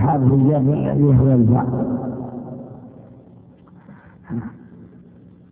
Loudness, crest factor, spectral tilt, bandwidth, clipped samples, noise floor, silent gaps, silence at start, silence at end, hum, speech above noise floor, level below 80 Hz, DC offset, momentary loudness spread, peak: -17 LUFS; 16 dB; -14.5 dB/octave; 3.1 kHz; under 0.1%; -46 dBFS; none; 0 s; 0.7 s; none; 30 dB; -42 dBFS; under 0.1%; 21 LU; -4 dBFS